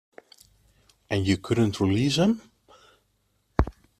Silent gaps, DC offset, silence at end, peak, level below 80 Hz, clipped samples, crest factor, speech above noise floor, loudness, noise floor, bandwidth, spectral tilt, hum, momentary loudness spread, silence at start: none; under 0.1%; 0.3 s; -2 dBFS; -42 dBFS; under 0.1%; 26 dB; 47 dB; -25 LUFS; -70 dBFS; 14 kHz; -6 dB/octave; 50 Hz at -45 dBFS; 8 LU; 1.1 s